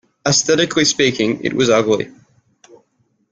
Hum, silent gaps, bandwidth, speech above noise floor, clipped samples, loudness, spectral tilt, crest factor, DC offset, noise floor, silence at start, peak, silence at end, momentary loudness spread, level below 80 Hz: none; none; 10 kHz; 48 dB; under 0.1%; -15 LUFS; -3 dB/octave; 16 dB; under 0.1%; -63 dBFS; 0.25 s; -2 dBFS; 1.2 s; 5 LU; -54 dBFS